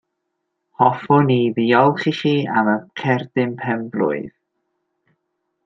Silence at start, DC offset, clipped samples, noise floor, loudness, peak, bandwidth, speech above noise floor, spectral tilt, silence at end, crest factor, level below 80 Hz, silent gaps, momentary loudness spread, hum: 0.8 s; under 0.1%; under 0.1%; -76 dBFS; -18 LUFS; -2 dBFS; 7.4 kHz; 58 dB; -8 dB/octave; 1.35 s; 18 dB; -64 dBFS; none; 8 LU; none